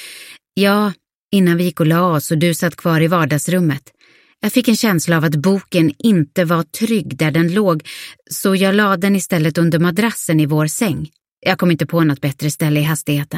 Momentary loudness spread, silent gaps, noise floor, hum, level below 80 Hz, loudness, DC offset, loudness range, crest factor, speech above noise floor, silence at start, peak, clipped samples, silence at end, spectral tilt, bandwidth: 7 LU; 1.15-1.30 s, 11.32-11.37 s; -38 dBFS; none; -56 dBFS; -16 LUFS; under 0.1%; 1 LU; 16 dB; 23 dB; 0 s; 0 dBFS; under 0.1%; 0 s; -5.5 dB/octave; 16.5 kHz